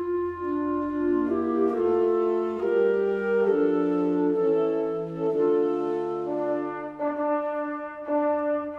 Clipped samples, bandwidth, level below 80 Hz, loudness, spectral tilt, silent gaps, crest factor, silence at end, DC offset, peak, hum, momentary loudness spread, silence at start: under 0.1%; 5.2 kHz; -62 dBFS; -25 LUFS; -9 dB/octave; none; 12 dB; 0 s; under 0.1%; -12 dBFS; none; 6 LU; 0 s